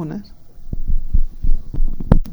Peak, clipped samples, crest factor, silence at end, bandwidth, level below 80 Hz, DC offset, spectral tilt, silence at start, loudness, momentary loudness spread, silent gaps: 0 dBFS; under 0.1%; 14 dB; 0 s; 1.9 kHz; -16 dBFS; under 0.1%; -9.5 dB/octave; 0 s; -25 LUFS; 14 LU; none